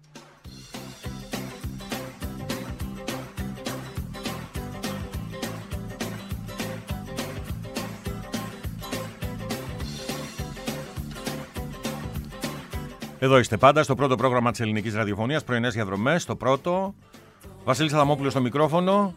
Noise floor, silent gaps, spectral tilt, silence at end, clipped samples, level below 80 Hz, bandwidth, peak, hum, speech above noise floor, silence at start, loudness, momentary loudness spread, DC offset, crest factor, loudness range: -47 dBFS; none; -5.5 dB/octave; 0 s; under 0.1%; -44 dBFS; 16 kHz; -4 dBFS; none; 25 dB; 0.15 s; -27 LUFS; 14 LU; under 0.1%; 24 dB; 11 LU